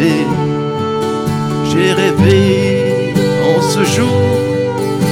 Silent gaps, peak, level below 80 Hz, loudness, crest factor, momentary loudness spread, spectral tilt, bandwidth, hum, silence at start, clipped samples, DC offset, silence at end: none; 0 dBFS; -44 dBFS; -13 LUFS; 12 dB; 6 LU; -6 dB/octave; 18.5 kHz; none; 0 s; under 0.1%; under 0.1%; 0 s